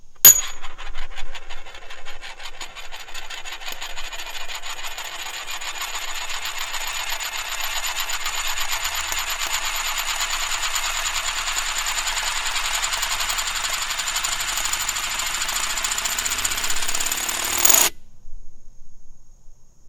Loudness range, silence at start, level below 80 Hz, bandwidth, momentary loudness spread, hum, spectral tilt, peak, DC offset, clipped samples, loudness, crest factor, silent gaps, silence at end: 12 LU; 0 s; -36 dBFS; 18 kHz; 15 LU; none; 1.5 dB/octave; 0 dBFS; under 0.1%; under 0.1%; -21 LUFS; 24 dB; none; 0 s